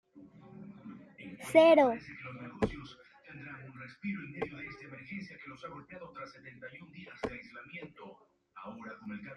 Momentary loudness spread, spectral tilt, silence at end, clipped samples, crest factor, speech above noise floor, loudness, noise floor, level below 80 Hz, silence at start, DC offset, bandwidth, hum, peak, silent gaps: 24 LU; -6 dB/octave; 0 s; under 0.1%; 24 dB; 22 dB; -31 LUFS; -55 dBFS; -62 dBFS; 0.15 s; under 0.1%; 12.5 kHz; none; -10 dBFS; none